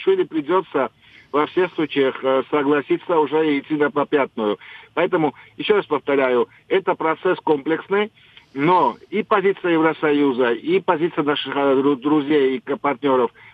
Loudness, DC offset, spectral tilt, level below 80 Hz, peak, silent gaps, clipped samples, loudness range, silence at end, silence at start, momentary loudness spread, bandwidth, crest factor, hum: -20 LUFS; under 0.1%; -8 dB/octave; -70 dBFS; -2 dBFS; none; under 0.1%; 2 LU; 0.25 s; 0 s; 5 LU; 5 kHz; 18 dB; none